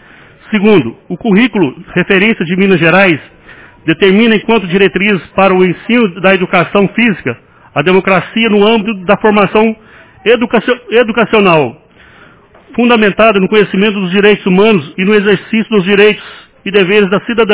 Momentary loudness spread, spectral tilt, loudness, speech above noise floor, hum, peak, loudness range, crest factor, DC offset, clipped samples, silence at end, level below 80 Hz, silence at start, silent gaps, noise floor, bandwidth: 8 LU; -10 dB/octave; -9 LUFS; 31 dB; none; 0 dBFS; 1 LU; 10 dB; under 0.1%; 1%; 0 s; -44 dBFS; 0.5 s; none; -40 dBFS; 4 kHz